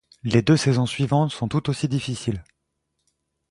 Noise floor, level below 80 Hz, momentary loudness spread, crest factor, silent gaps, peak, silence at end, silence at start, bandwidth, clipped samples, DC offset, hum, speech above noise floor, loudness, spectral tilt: -76 dBFS; -50 dBFS; 10 LU; 20 dB; none; -2 dBFS; 1.1 s; 0.25 s; 11.5 kHz; under 0.1%; under 0.1%; none; 55 dB; -22 LUFS; -6 dB/octave